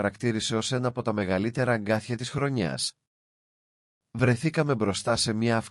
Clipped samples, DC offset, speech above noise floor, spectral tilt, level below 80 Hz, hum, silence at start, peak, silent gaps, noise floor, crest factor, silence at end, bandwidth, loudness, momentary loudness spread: under 0.1%; under 0.1%; over 64 dB; -5 dB/octave; -60 dBFS; none; 0 s; -10 dBFS; 3.07-4.01 s; under -90 dBFS; 16 dB; 0 s; 12 kHz; -27 LUFS; 4 LU